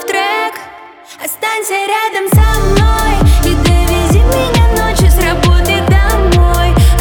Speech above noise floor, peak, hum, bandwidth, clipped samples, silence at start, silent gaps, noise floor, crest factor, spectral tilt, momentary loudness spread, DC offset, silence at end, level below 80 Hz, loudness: 23 dB; 0 dBFS; none; 19.5 kHz; under 0.1%; 0 s; none; -34 dBFS; 10 dB; -5 dB/octave; 6 LU; under 0.1%; 0 s; -12 dBFS; -11 LUFS